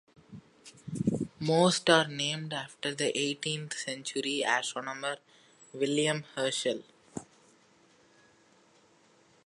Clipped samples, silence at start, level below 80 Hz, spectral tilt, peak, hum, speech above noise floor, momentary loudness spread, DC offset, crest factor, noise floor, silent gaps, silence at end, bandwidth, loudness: under 0.1%; 0.3 s; -68 dBFS; -3.5 dB/octave; -8 dBFS; none; 33 dB; 20 LU; under 0.1%; 26 dB; -64 dBFS; none; 2.2 s; 11.5 kHz; -30 LUFS